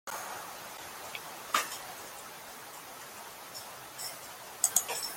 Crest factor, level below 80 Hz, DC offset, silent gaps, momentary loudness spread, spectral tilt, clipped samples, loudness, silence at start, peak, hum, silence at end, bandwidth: 30 dB; -74 dBFS; under 0.1%; none; 16 LU; 0.5 dB/octave; under 0.1%; -36 LUFS; 0.05 s; -8 dBFS; none; 0 s; 17 kHz